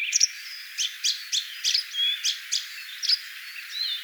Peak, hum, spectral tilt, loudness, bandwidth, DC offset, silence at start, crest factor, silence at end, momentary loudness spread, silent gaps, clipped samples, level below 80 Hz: -6 dBFS; none; 14.5 dB/octave; -25 LUFS; over 20 kHz; under 0.1%; 0 s; 22 dB; 0 s; 12 LU; none; under 0.1%; under -90 dBFS